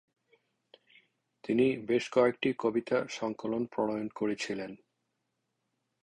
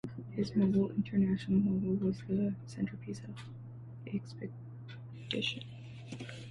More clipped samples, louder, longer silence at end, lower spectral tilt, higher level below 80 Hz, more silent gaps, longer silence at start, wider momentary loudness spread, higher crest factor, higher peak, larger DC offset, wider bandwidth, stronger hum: neither; first, -31 LUFS vs -35 LUFS; first, 1.25 s vs 0 s; second, -5.5 dB/octave vs -7.5 dB/octave; second, -72 dBFS vs -64 dBFS; neither; first, 1.45 s vs 0.05 s; second, 9 LU vs 18 LU; first, 22 dB vs 16 dB; first, -12 dBFS vs -18 dBFS; neither; about the same, 10.5 kHz vs 10 kHz; neither